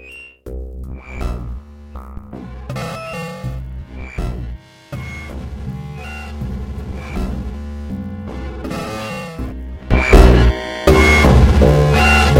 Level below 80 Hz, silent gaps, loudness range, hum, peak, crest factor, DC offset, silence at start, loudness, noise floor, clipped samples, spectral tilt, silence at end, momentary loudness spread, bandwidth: -20 dBFS; none; 16 LU; none; 0 dBFS; 16 dB; under 0.1%; 0 s; -16 LUFS; -35 dBFS; 0.1%; -6 dB/octave; 0 s; 22 LU; 16 kHz